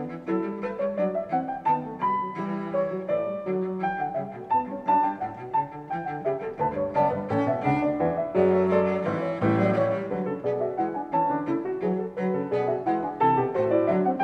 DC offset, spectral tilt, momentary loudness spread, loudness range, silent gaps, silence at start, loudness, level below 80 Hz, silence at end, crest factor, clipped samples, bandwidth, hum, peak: under 0.1%; -9.5 dB/octave; 7 LU; 4 LU; none; 0 s; -26 LUFS; -60 dBFS; 0 s; 16 dB; under 0.1%; 6.4 kHz; none; -10 dBFS